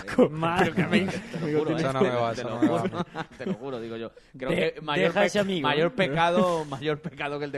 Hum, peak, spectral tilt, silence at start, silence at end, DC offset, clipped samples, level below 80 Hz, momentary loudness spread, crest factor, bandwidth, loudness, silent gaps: none; -8 dBFS; -6 dB/octave; 0 s; 0 s; under 0.1%; under 0.1%; -56 dBFS; 12 LU; 18 dB; 12.5 kHz; -26 LUFS; none